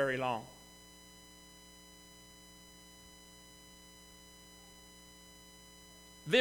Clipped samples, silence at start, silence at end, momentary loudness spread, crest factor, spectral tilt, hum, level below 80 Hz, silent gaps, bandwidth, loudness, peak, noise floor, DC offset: under 0.1%; 0 s; 0 s; 17 LU; 28 dB; -3.5 dB/octave; none; -68 dBFS; none; 19 kHz; -44 LUFS; -14 dBFS; -57 dBFS; under 0.1%